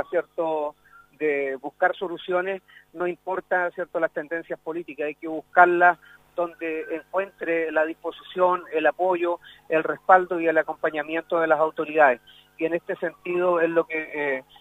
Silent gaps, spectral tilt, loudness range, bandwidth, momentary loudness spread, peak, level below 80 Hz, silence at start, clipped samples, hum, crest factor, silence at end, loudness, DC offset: none; -6.5 dB/octave; 5 LU; 15 kHz; 12 LU; -2 dBFS; -70 dBFS; 0 s; under 0.1%; none; 22 dB; 0.2 s; -24 LUFS; under 0.1%